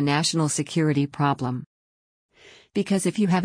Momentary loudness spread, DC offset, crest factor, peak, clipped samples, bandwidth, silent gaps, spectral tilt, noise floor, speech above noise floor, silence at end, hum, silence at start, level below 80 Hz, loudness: 8 LU; under 0.1%; 16 dB; -8 dBFS; under 0.1%; 10.5 kHz; 1.66-2.29 s; -5 dB/octave; under -90 dBFS; over 67 dB; 0 s; none; 0 s; -62 dBFS; -24 LUFS